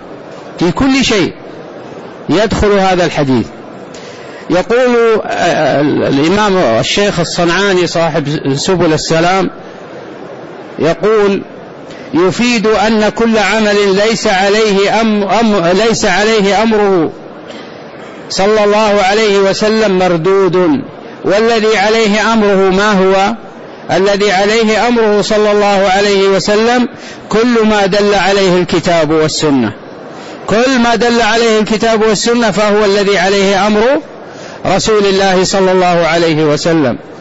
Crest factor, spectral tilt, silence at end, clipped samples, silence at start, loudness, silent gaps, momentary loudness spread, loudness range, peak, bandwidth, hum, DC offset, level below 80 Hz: 8 dB; -4.5 dB/octave; 0 s; under 0.1%; 0 s; -10 LUFS; none; 19 LU; 3 LU; -2 dBFS; 8 kHz; none; 0.6%; -36 dBFS